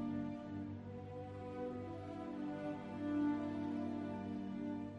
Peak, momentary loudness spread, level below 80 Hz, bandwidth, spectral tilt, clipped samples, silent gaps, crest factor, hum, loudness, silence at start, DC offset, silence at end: -28 dBFS; 9 LU; -70 dBFS; 7.4 kHz; -8.5 dB/octave; under 0.1%; none; 14 dB; none; -44 LUFS; 0 s; under 0.1%; 0 s